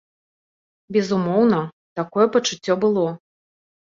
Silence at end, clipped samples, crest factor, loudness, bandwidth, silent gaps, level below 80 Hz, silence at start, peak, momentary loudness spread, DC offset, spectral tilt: 0.7 s; under 0.1%; 18 dB; -20 LUFS; 7.6 kHz; 1.73-1.96 s; -66 dBFS; 0.9 s; -4 dBFS; 10 LU; under 0.1%; -5.5 dB/octave